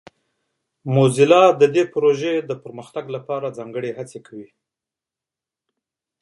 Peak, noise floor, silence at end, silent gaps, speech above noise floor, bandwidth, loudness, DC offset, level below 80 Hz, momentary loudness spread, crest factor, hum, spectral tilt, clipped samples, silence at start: 0 dBFS; -88 dBFS; 1.8 s; none; 70 dB; 11.5 kHz; -18 LUFS; under 0.1%; -68 dBFS; 20 LU; 20 dB; none; -6 dB/octave; under 0.1%; 0.85 s